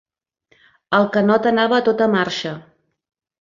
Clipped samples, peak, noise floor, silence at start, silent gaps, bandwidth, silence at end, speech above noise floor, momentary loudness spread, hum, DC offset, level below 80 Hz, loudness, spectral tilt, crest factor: under 0.1%; -2 dBFS; -62 dBFS; 0.9 s; none; 7.4 kHz; 0.8 s; 45 dB; 10 LU; none; under 0.1%; -62 dBFS; -17 LUFS; -6 dB/octave; 18 dB